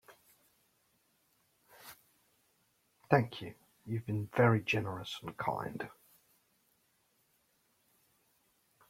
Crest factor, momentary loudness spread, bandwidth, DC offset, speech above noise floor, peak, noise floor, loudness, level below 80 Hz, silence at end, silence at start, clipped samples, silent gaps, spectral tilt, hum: 30 dB; 25 LU; 16 kHz; under 0.1%; 42 dB; -10 dBFS; -75 dBFS; -34 LUFS; -72 dBFS; 3 s; 0.1 s; under 0.1%; none; -7 dB/octave; none